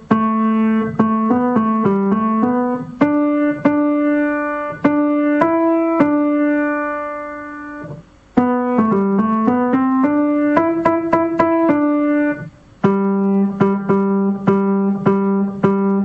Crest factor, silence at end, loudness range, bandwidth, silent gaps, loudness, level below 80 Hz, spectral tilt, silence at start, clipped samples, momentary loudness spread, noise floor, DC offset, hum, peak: 14 dB; 0 s; 3 LU; 5 kHz; none; -16 LUFS; -54 dBFS; -10 dB/octave; 0 s; under 0.1%; 6 LU; -36 dBFS; under 0.1%; none; -2 dBFS